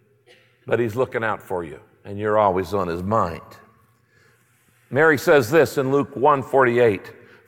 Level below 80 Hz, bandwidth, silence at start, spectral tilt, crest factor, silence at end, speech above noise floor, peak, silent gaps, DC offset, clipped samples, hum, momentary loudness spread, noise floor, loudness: -56 dBFS; 17 kHz; 0.65 s; -6 dB/octave; 18 dB; 0.35 s; 40 dB; -4 dBFS; none; under 0.1%; under 0.1%; none; 14 LU; -60 dBFS; -20 LUFS